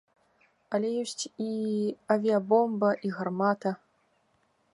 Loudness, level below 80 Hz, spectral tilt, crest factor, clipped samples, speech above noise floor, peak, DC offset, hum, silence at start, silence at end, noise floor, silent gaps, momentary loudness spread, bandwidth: -29 LUFS; -78 dBFS; -5.5 dB/octave; 20 dB; under 0.1%; 43 dB; -8 dBFS; under 0.1%; none; 0.7 s; 1 s; -70 dBFS; none; 10 LU; 11.5 kHz